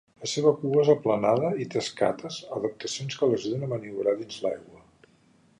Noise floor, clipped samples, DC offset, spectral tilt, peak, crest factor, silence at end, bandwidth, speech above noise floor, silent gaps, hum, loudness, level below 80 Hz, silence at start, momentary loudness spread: -61 dBFS; under 0.1%; under 0.1%; -5.5 dB/octave; -8 dBFS; 20 dB; 0.85 s; 10.5 kHz; 35 dB; none; none; -27 LUFS; -68 dBFS; 0.2 s; 10 LU